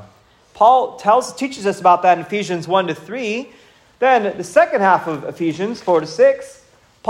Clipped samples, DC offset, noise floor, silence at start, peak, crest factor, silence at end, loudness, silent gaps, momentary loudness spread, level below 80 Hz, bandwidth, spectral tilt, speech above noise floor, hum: under 0.1%; under 0.1%; -50 dBFS; 0 s; 0 dBFS; 16 dB; 0 s; -17 LUFS; none; 11 LU; -64 dBFS; 12.5 kHz; -5 dB/octave; 34 dB; none